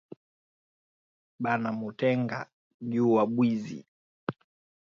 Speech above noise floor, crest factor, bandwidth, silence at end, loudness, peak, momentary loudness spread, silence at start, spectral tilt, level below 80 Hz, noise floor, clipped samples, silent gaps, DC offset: over 63 dB; 20 dB; 7 kHz; 0.55 s; -29 LUFS; -12 dBFS; 17 LU; 1.4 s; -8 dB/octave; -74 dBFS; under -90 dBFS; under 0.1%; 2.53-2.80 s, 3.88-4.27 s; under 0.1%